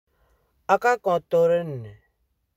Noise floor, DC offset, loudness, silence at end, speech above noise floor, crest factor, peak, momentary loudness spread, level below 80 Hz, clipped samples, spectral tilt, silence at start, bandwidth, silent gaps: -72 dBFS; under 0.1%; -22 LUFS; 0.65 s; 50 dB; 20 dB; -4 dBFS; 18 LU; -64 dBFS; under 0.1%; -6 dB/octave; 0.7 s; 15 kHz; none